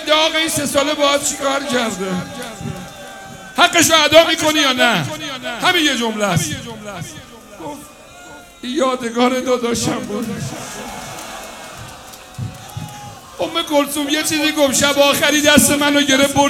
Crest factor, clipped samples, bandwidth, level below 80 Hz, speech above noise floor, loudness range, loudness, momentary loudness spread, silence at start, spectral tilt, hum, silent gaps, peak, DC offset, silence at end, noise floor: 18 dB; under 0.1%; 19.5 kHz; -48 dBFS; 22 dB; 10 LU; -15 LUFS; 21 LU; 0 s; -2.5 dB/octave; none; none; 0 dBFS; under 0.1%; 0 s; -38 dBFS